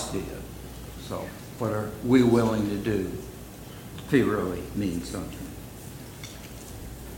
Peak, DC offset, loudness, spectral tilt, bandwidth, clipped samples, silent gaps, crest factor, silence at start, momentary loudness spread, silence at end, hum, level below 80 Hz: -8 dBFS; under 0.1%; -27 LUFS; -6 dB/octave; 17 kHz; under 0.1%; none; 22 dB; 0 s; 19 LU; 0 s; none; -46 dBFS